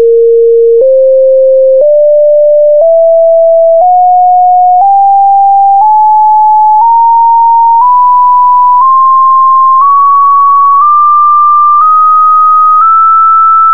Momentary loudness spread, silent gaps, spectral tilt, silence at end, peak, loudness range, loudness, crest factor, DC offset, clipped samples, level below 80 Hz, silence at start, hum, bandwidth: 1 LU; none; -7.5 dB/octave; 0 s; 0 dBFS; 1 LU; -4 LUFS; 4 dB; 5%; under 0.1%; -70 dBFS; 0 s; none; 1.7 kHz